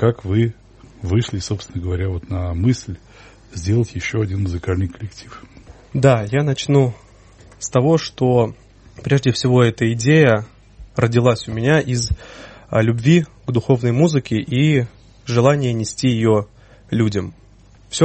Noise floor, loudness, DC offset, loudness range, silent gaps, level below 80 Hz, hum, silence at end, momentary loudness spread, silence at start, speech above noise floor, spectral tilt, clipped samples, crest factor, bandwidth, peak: -47 dBFS; -18 LUFS; under 0.1%; 6 LU; none; -40 dBFS; none; 0 s; 15 LU; 0 s; 30 dB; -6.5 dB/octave; under 0.1%; 18 dB; 8.8 kHz; 0 dBFS